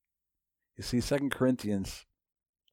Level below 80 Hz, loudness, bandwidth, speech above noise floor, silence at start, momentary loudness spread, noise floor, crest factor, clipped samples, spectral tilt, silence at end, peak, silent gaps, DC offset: -54 dBFS; -31 LUFS; 16.5 kHz; 57 dB; 0.8 s; 13 LU; -88 dBFS; 20 dB; under 0.1%; -5.5 dB/octave; 0.7 s; -14 dBFS; none; under 0.1%